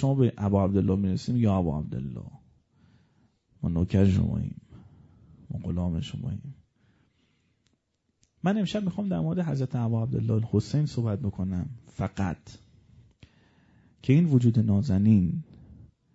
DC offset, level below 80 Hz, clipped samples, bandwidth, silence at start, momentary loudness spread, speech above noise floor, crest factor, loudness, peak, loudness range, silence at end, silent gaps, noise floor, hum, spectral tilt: under 0.1%; -50 dBFS; under 0.1%; 8 kHz; 0 s; 15 LU; 49 dB; 18 dB; -27 LUFS; -10 dBFS; 9 LU; 0.3 s; none; -74 dBFS; none; -8.5 dB/octave